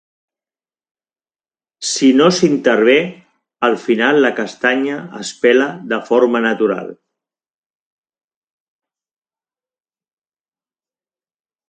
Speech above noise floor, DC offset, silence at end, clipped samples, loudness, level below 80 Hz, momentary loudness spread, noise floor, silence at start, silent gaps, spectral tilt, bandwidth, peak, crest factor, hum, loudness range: over 76 dB; under 0.1%; 4.75 s; under 0.1%; -15 LUFS; -66 dBFS; 13 LU; under -90 dBFS; 1.8 s; none; -4 dB/octave; 9.4 kHz; 0 dBFS; 18 dB; none; 6 LU